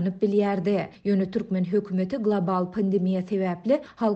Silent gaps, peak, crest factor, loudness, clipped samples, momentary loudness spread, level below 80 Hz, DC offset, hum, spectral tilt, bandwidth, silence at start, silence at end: none; -12 dBFS; 14 dB; -25 LUFS; under 0.1%; 4 LU; -62 dBFS; under 0.1%; none; -9.5 dB/octave; 6 kHz; 0 s; 0 s